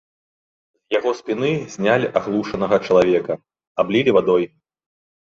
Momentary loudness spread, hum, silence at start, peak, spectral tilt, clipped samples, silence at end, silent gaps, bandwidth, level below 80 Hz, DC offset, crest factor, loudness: 9 LU; none; 0.9 s; -2 dBFS; -6 dB/octave; under 0.1%; 0.75 s; 3.67-3.75 s; 7.6 kHz; -56 dBFS; under 0.1%; 18 dB; -19 LUFS